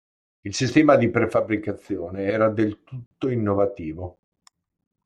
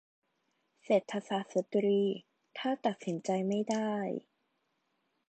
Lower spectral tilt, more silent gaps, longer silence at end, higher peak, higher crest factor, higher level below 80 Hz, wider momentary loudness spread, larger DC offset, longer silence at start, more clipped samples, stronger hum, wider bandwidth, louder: about the same, -6.5 dB/octave vs -6 dB/octave; first, 3.06-3.11 s vs none; second, 0.95 s vs 1.1 s; first, -4 dBFS vs -14 dBFS; about the same, 20 dB vs 20 dB; first, -58 dBFS vs -84 dBFS; first, 19 LU vs 9 LU; neither; second, 0.45 s vs 0.9 s; neither; neither; first, 10.5 kHz vs 9 kHz; first, -22 LUFS vs -33 LUFS